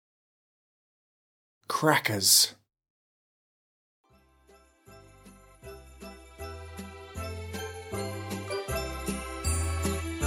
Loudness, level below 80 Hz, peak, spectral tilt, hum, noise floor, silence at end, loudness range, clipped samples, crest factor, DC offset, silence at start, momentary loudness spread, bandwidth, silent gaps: -28 LUFS; -44 dBFS; -6 dBFS; -2.5 dB/octave; none; -61 dBFS; 0 s; 20 LU; under 0.1%; 28 dB; under 0.1%; 1.7 s; 26 LU; 17.5 kHz; 2.90-4.04 s